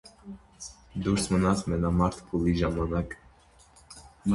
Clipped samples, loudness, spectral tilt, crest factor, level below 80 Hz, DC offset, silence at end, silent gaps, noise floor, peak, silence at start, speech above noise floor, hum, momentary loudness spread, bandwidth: under 0.1%; -28 LUFS; -6.5 dB/octave; 18 dB; -42 dBFS; under 0.1%; 0 s; none; -57 dBFS; -10 dBFS; 0.05 s; 31 dB; none; 22 LU; 11.5 kHz